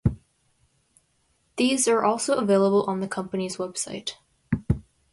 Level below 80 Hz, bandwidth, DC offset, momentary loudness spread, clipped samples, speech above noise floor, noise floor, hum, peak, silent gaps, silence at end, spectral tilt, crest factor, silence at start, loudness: -46 dBFS; 11.5 kHz; under 0.1%; 12 LU; under 0.1%; 45 dB; -68 dBFS; none; -8 dBFS; none; 0.3 s; -5 dB/octave; 18 dB; 0.05 s; -25 LUFS